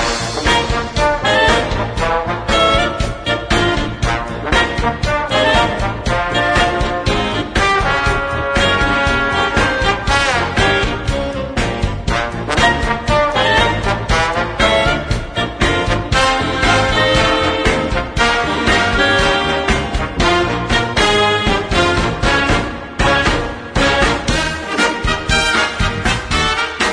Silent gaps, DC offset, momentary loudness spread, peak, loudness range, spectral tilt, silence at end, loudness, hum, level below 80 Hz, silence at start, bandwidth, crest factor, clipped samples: none; under 0.1%; 6 LU; 0 dBFS; 2 LU; -4 dB/octave; 0 s; -15 LUFS; none; -24 dBFS; 0 s; 10.5 kHz; 16 dB; under 0.1%